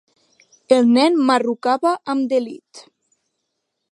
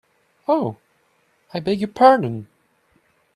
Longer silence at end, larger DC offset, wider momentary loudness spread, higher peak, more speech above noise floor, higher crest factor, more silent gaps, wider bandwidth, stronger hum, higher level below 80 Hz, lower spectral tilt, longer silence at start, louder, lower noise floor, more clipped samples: first, 1.1 s vs 0.9 s; neither; second, 8 LU vs 18 LU; about the same, -2 dBFS vs 0 dBFS; first, 59 dB vs 45 dB; about the same, 18 dB vs 22 dB; neither; about the same, 11 kHz vs 12 kHz; neither; second, -74 dBFS vs -62 dBFS; second, -4.5 dB/octave vs -7.5 dB/octave; first, 0.7 s vs 0.5 s; about the same, -17 LUFS vs -19 LUFS; first, -76 dBFS vs -63 dBFS; neither